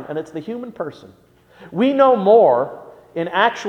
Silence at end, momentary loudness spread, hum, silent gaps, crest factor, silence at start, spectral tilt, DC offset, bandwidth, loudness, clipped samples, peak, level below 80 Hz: 0 s; 18 LU; none; none; 16 dB; 0 s; -6 dB/octave; under 0.1%; 9 kHz; -16 LUFS; under 0.1%; -2 dBFS; -64 dBFS